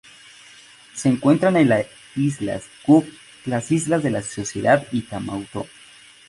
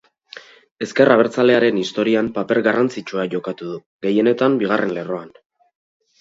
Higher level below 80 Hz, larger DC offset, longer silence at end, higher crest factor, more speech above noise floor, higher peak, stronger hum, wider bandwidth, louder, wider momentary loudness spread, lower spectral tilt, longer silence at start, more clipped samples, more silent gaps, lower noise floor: first, -56 dBFS vs -62 dBFS; neither; second, 0.6 s vs 0.95 s; about the same, 18 dB vs 18 dB; about the same, 27 dB vs 25 dB; about the same, -2 dBFS vs 0 dBFS; neither; first, 11.5 kHz vs 7.8 kHz; second, -21 LUFS vs -18 LUFS; about the same, 15 LU vs 15 LU; about the same, -6 dB/octave vs -6 dB/octave; first, 0.95 s vs 0.35 s; neither; second, none vs 0.71-0.76 s, 3.86-3.99 s; first, -47 dBFS vs -42 dBFS